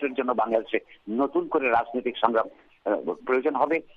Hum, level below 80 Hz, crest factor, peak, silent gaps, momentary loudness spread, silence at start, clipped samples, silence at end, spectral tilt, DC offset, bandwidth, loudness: none; -66 dBFS; 22 dB; -4 dBFS; none; 8 LU; 0 s; under 0.1%; 0.15 s; -7 dB/octave; under 0.1%; 5.6 kHz; -26 LUFS